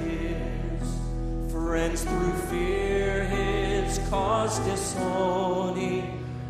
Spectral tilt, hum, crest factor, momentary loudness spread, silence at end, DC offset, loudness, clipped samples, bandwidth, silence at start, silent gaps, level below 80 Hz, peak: -5.5 dB/octave; none; 16 dB; 6 LU; 0 s; under 0.1%; -28 LUFS; under 0.1%; 15 kHz; 0 s; none; -34 dBFS; -12 dBFS